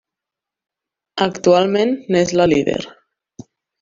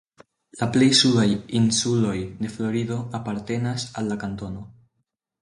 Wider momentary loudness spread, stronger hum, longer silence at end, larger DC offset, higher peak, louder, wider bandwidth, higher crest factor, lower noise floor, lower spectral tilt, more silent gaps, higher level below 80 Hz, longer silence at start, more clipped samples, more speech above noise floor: about the same, 12 LU vs 14 LU; neither; first, 0.9 s vs 0.7 s; neither; about the same, -2 dBFS vs -4 dBFS; first, -16 LUFS vs -22 LUFS; second, 7.6 kHz vs 11.5 kHz; about the same, 18 dB vs 20 dB; first, -86 dBFS vs -76 dBFS; about the same, -5 dB/octave vs -4.5 dB/octave; neither; about the same, -52 dBFS vs -52 dBFS; first, 1.15 s vs 0.55 s; neither; first, 70 dB vs 54 dB